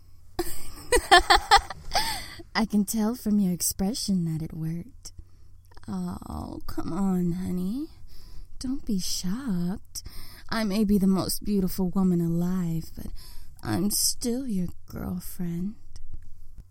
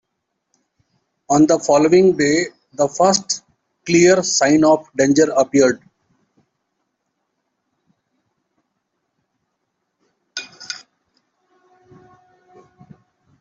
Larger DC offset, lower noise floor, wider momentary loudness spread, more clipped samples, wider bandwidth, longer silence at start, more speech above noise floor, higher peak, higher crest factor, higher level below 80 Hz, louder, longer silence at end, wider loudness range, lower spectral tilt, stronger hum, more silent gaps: neither; second, -47 dBFS vs -75 dBFS; about the same, 17 LU vs 18 LU; neither; first, 16.5 kHz vs 8.2 kHz; second, 0 s vs 1.3 s; second, 21 dB vs 61 dB; about the same, -2 dBFS vs -2 dBFS; first, 24 dB vs 18 dB; first, -40 dBFS vs -60 dBFS; second, -26 LUFS vs -15 LUFS; second, 0.1 s vs 2.65 s; second, 9 LU vs 22 LU; about the same, -4 dB/octave vs -4 dB/octave; neither; neither